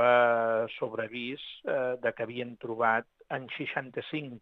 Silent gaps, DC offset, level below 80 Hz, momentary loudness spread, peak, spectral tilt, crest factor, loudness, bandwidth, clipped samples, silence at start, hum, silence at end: none; under 0.1%; -76 dBFS; 12 LU; -12 dBFS; -7 dB/octave; 18 dB; -31 LUFS; 4.3 kHz; under 0.1%; 0 s; none; 0.05 s